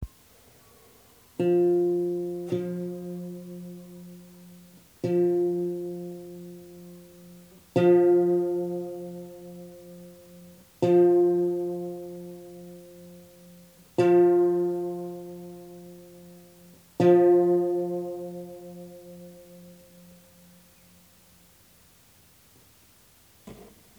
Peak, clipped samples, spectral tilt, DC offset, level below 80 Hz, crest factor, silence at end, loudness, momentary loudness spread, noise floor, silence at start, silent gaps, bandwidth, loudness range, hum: -8 dBFS; under 0.1%; -8.5 dB/octave; under 0.1%; -62 dBFS; 18 dB; 0.35 s; -24 LUFS; 26 LU; -58 dBFS; 0 s; none; 19.5 kHz; 6 LU; none